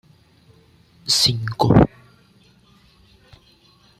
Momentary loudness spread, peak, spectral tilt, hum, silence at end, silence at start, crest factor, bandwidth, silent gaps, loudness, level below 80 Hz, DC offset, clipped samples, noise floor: 6 LU; -2 dBFS; -4.5 dB/octave; none; 2.15 s; 1.05 s; 22 dB; 15.5 kHz; none; -17 LUFS; -42 dBFS; under 0.1%; under 0.1%; -54 dBFS